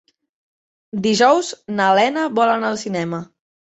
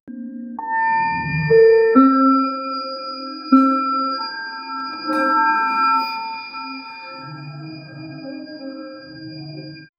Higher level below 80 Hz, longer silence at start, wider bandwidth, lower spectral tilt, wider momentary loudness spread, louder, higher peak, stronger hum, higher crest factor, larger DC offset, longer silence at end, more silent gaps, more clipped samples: second, -64 dBFS vs -56 dBFS; first, 0.95 s vs 0.05 s; first, 8.2 kHz vs 5.4 kHz; second, -4.5 dB/octave vs -7.5 dB/octave; second, 11 LU vs 21 LU; about the same, -18 LUFS vs -18 LUFS; about the same, -2 dBFS vs 0 dBFS; neither; about the same, 18 dB vs 18 dB; neither; first, 0.55 s vs 0.15 s; neither; neither